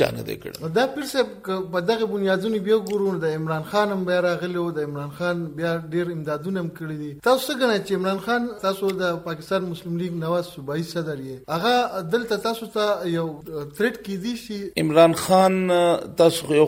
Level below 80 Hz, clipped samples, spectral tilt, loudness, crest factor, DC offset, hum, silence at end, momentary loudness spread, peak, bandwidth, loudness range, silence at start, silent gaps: -58 dBFS; under 0.1%; -5.5 dB/octave; -23 LUFS; 20 dB; under 0.1%; none; 0 s; 11 LU; -4 dBFS; 16.5 kHz; 5 LU; 0 s; none